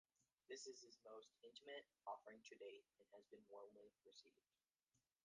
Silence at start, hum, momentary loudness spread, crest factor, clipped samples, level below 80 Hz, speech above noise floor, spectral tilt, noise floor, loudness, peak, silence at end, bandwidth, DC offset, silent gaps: 0.2 s; none; 11 LU; 22 dB; under 0.1%; under -90 dBFS; over 28 dB; -1 dB/octave; under -90 dBFS; -61 LUFS; -42 dBFS; 0.25 s; 9.6 kHz; under 0.1%; 4.83-4.87 s